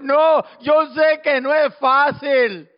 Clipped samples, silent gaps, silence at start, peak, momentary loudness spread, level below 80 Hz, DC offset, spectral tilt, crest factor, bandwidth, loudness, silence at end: under 0.1%; none; 0 s; -6 dBFS; 3 LU; -68 dBFS; under 0.1%; -1.5 dB/octave; 10 dB; 5.4 kHz; -16 LUFS; 0.15 s